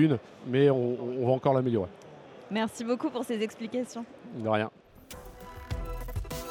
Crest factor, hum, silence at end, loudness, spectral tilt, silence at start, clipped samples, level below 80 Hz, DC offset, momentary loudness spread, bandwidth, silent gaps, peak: 18 dB; none; 0 s; -30 LUFS; -7 dB/octave; 0 s; under 0.1%; -46 dBFS; under 0.1%; 21 LU; 18 kHz; none; -12 dBFS